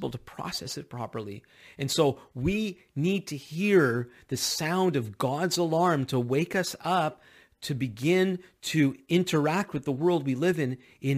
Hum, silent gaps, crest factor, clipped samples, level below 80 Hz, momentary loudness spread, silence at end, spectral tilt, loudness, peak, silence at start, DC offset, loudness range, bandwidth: none; none; 18 dB; under 0.1%; -58 dBFS; 12 LU; 0 s; -5 dB/octave; -28 LUFS; -10 dBFS; 0 s; under 0.1%; 2 LU; 15.5 kHz